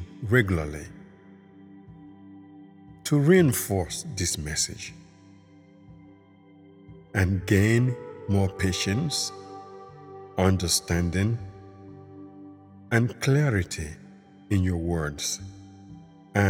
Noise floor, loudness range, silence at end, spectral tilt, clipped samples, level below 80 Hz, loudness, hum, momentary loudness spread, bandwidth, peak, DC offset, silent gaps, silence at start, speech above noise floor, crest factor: -53 dBFS; 4 LU; 0 s; -5 dB/octave; under 0.1%; -48 dBFS; -25 LUFS; none; 24 LU; 18 kHz; -6 dBFS; under 0.1%; none; 0 s; 29 dB; 20 dB